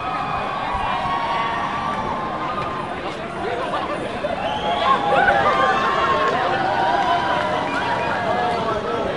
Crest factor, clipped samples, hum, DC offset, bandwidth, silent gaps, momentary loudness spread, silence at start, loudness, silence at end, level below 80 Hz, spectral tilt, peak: 18 dB; under 0.1%; none; 0.4%; 11.5 kHz; none; 8 LU; 0 s; -21 LUFS; 0 s; -46 dBFS; -5 dB/octave; -4 dBFS